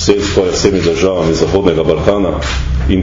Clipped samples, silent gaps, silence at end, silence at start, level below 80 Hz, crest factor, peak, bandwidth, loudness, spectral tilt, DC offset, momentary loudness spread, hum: 0.2%; none; 0 s; 0 s; -22 dBFS; 12 dB; 0 dBFS; 7.6 kHz; -13 LUFS; -5.5 dB/octave; under 0.1%; 4 LU; none